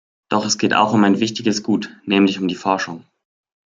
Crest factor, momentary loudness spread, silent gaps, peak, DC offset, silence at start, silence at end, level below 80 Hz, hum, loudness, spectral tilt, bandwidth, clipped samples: 18 dB; 8 LU; none; 0 dBFS; under 0.1%; 0.3 s; 0.8 s; -64 dBFS; none; -18 LUFS; -4.5 dB/octave; 7.8 kHz; under 0.1%